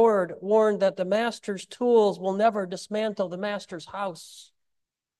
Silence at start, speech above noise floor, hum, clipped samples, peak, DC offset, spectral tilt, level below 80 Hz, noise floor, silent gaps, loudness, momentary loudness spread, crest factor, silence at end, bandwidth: 0 s; 56 dB; none; under 0.1%; -8 dBFS; under 0.1%; -5.5 dB/octave; -76 dBFS; -81 dBFS; none; -26 LUFS; 13 LU; 16 dB; 0.75 s; 12.5 kHz